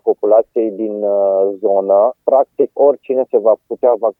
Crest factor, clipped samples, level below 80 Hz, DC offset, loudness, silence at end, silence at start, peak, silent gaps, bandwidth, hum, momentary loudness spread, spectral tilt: 14 dB; under 0.1%; -74 dBFS; under 0.1%; -14 LUFS; 0.1 s; 0.05 s; 0 dBFS; none; 3 kHz; none; 5 LU; -10.5 dB/octave